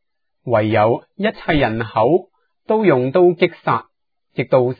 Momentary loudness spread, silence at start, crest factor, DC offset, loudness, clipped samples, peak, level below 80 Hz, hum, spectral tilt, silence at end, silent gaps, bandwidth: 8 LU; 0.45 s; 16 dB; under 0.1%; -17 LUFS; under 0.1%; -2 dBFS; -42 dBFS; none; -10 dB/octave; 0.05 s; none; 4.9 kHz